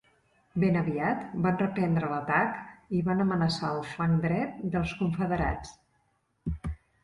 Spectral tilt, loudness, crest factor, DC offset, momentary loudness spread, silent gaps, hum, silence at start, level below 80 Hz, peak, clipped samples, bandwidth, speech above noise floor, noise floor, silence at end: -7.5 dB/octave; -29 LUFS; 18 dB; under 0.1%; 11 LU; none; none; 0.55 s; -46 dBFS; -12 dBFS; under 0.1%; 11 kHz; 44 dB; -72 dBFS; 0.3 s